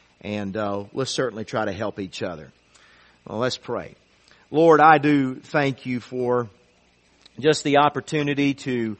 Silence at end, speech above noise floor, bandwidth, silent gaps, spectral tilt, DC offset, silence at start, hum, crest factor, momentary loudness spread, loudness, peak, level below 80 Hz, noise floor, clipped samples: 0.05 s; 38 dB; 8.8 kHz; none; -5.5 dB/octave; under 0.1%; 0.25 s; none; 22 dB; 16 LU; -22 LUFS; 0 dBFS; -62 dBFS; -60 dBFS; under 0.1%